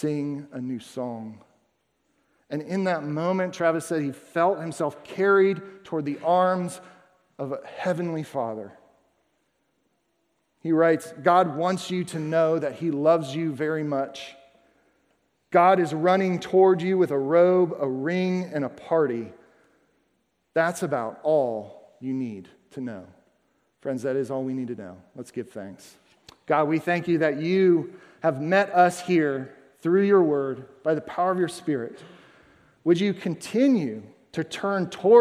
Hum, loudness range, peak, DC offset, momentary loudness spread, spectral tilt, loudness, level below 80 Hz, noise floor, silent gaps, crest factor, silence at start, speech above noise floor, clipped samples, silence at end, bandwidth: none; 10 LU; -6 dBFS; under 0.1%; 16 LU; -6.5 dB/octave; -24 LUFS; -74 dBFS; -72 dBFS; none; 20 dB; 0 s; 49 dB; under 0.1%; 0 s; 14 kHz